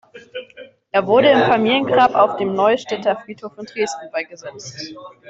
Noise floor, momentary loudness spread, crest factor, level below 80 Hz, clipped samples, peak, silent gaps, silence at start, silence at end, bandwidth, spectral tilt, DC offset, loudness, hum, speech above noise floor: -43 dBFS; 20 LU; 16 dB; -60 dBFS; under 0.1%; -2 dBFS; none; 0.15 s; 0.2 s; 8 kHz; -4.5 dB/octave; under 0.1%; -17 LUFS; none; 25 dB